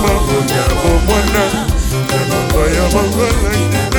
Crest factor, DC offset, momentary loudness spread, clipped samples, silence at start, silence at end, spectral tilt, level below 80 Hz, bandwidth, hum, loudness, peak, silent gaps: 12 dB; under 0.1%; 3 LU; under 0.1%; 0 s; 0 s; -5 dB/octave; -18 dBFS; over 20 kHz; none; -14 LUFS; -2 dBFS; none